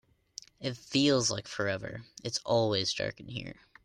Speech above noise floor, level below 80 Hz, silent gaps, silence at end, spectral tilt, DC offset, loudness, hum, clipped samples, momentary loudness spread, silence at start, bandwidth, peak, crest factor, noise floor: 21 dB; -64 dBFS; none; 0.3 s; -4 dB/octave; under 0.1%; -31 LUFS; none; under 0.1%; 19 LU; 0.6 s; 12.5 kHz; -14 dBFS; 18 dB; -52 dBFS